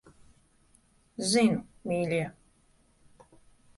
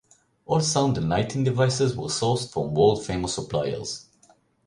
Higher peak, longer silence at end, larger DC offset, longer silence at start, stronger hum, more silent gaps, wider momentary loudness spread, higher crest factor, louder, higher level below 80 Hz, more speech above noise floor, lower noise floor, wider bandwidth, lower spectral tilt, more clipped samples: second, -12 dBFS vs -6 dBFS; first, 1.45 s vs 0.65 s; neither; first, 1.2 s vs 0.5 s; neither; neither; first, 13 LU vs 7 LU; about the same, 20 dB vs 18 dB; second, -29 LUFS vs -24 LUFS; second, -64 dBFS vs -50 dBFS; about the same, 38 dB vs 36 dB; first, -65 dBFS vs -60 dBFS; about the same, 11.5 kHz vs 11.5 kHz; about the same, -4.5 dB/octave vs -5 dB/octave; neither